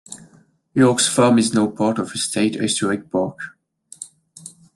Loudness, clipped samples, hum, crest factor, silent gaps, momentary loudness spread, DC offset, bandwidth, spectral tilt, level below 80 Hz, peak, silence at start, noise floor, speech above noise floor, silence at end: -18 LUFS; under 0.1%; none; 18 dB; none; 23 LU; under 0.1%; 12.5 kHz; -4 dB/octave; -64 dBFS; -2 dBFS; 0.1 s; -54 dBFS; 36 dB; 0.25 s